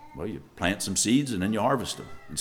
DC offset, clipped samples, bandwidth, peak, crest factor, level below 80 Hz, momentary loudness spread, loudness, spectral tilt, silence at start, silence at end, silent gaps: under 0.1%; under 0.1%; 18.5 kHz; -8 dBFS; 20 dB; -54 dBFS; 13 LU; -27 LUFS; -4 dB/octave; 0 s; 0 s; none